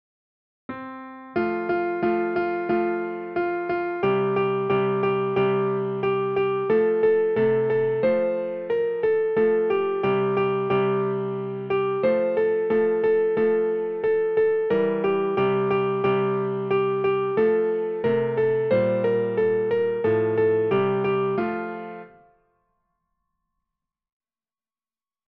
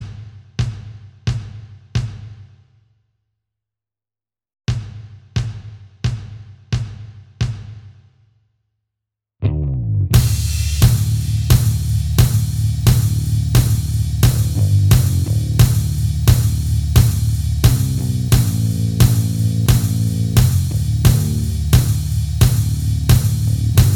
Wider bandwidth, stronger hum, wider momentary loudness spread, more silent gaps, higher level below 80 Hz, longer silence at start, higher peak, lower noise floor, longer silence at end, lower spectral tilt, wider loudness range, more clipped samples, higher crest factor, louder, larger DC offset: second, 5.2 kHz vs 18.5 kHz; neither; second, 6 LU vs 13 LU; neither; second, -62 dBFS vs -24 dBFS; first, 0.7 s vs 0 s; second, -10 dBFS vs 0 dBFS; about the same, under -90 dBFS vs under -90 dBFS; first, 3.2 s vs 0 s; first, -9.5 dB/octave vs -5.5 dB/octave; second, 4 LU vs 14 LU; neither; about the same, 12 dB vs 16 dB; second, -23 LUFS vs -17 LUFS; neither